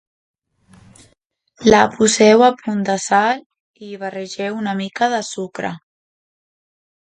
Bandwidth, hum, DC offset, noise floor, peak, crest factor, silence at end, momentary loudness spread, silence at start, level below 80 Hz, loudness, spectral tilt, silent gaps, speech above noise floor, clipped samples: 10 kHz; none; under 0.1%; -63 dBFS; 0 dBFS; 18 dB; 1.35 s; 16 LU; 1.6 s; -54 dBFS; -16 LUFS; -4 dB/octave; 3.46-3.50 s, 3.60-3.74 s; 47 dB; under 0.1%